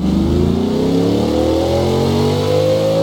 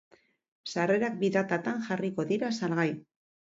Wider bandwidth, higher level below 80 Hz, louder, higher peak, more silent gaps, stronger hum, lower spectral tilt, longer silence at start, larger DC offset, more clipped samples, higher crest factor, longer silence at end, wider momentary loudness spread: first, 18 kHz vs 7.8 kHz; first, -30 dBFS vs -74 dBFS; first, -15 LUFS vs -30 LUFS; first, -2 dBFS vs -12 dBFS; neither; neither; about the same, -7 dB/octave vs -6 dB/octave; second, 0 s vs 0.65 s; neither; neither; second, 12 dB vs 18 dB; second, 0 s vs 0.55 s; second, 1 LU vs 7 LU